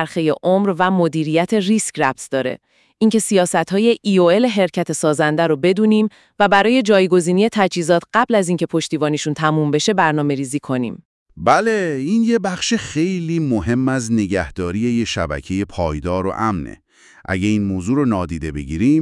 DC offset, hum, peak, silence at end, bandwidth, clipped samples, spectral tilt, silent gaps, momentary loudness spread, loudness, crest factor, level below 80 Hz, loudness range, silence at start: under 0.1%; none; 0 dBFS; 0 s; 12 kHz; under 0.1%; -5.5 dB/octave; 11.05-11.26 s; 8 LU; -17 LUFS; 18 dB; -44 dBFS; 5 LU; 0 s